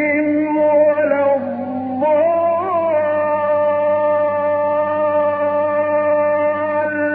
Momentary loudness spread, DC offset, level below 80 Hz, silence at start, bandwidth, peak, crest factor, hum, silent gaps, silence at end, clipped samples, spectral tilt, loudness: 4 LU; under 0.1%; -68 dBFS; 0 s; 3.6 kHz; -4 dBFS; 12 dB; none; none; 0 s; under 0.1%; -5.5 dB/octave; -16 LUFS